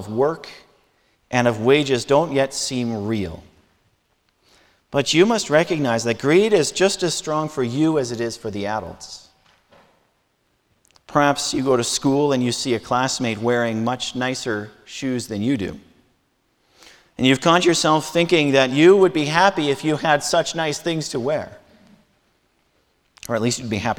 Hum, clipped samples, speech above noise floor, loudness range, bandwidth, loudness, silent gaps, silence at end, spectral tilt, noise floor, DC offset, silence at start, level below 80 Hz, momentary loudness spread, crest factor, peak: none; under 0.1%; 47 dB; 9 LU; 18 kHz; -19 LUFS; none; 0.05 s; -4.5 dB/octave; -67 dBFS; under 0.1%; 0 s; -54 dBFS; 11 LU; 20 dB; 0 dBFS